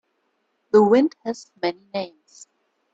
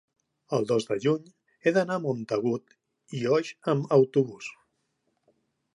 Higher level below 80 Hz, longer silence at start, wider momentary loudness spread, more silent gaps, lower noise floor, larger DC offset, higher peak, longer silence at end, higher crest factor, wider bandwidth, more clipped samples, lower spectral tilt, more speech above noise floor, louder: first, -70 dBFS vs -76 dBFS; first, 0.75 s vs 0.5 s; first, 16 LU vs 10 LU; neither; second, -71 dBFS vs -76 dBFS; neither; first, -4 dBFS vs -8 dBFS; second, 0.85 s vs 1.25 s; about the same, 18 dB vs 20 dB; second, 7.8 kHz vs 11 kHz; neither; about the same, -6 dB/octave vs -6.5 dB/octave; about the same, 50 dB vs 50 dB; first, -21 LUFS vs -27 LUFS